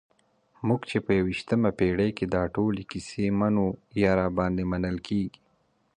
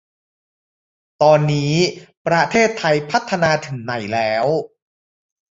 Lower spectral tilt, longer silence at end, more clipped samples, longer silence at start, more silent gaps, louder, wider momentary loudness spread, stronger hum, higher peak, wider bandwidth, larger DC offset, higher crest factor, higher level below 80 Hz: first, -7.5 dB/octave vs -5 dB/octave; second, 0.7 s vs 0.95 s; neither; second, 0.6 s vs 1.2 s; second, none vs 2.17-2.25 s; second, -27 LUFS vs -18 LUFS; second, 6 LU vs 10 LU; neither; second, -10 dBFS vs -2 dBFS; first, 9.8 kHz vs 8 kHz; neither; about the same, 18 dB vs 18 dB; first, -48 dBFS vs -56 dBFS